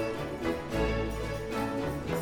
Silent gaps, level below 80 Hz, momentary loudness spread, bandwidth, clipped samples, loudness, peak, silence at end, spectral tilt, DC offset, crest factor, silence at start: none; -42 dBFS; 3 LU; 19 kHz; under 0.1%; -33 LUFS; -18 dBFS; 0 s; -6 dB/octave; under 0.1%; 14 dB; 0 s